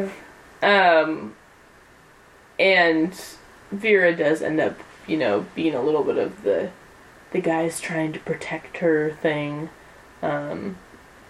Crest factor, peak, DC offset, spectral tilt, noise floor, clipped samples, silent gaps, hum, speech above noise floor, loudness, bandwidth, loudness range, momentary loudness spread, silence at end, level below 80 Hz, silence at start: 18 dB; -4 dBFS; under 0.1%; -5 dB/octave; -51 dBFS; under 0.1%; none; none; 29 dB; -22 LUFS; 14 kHz; 5 LU; 18 LU; 0.5 s; -60 dBFS; 0 s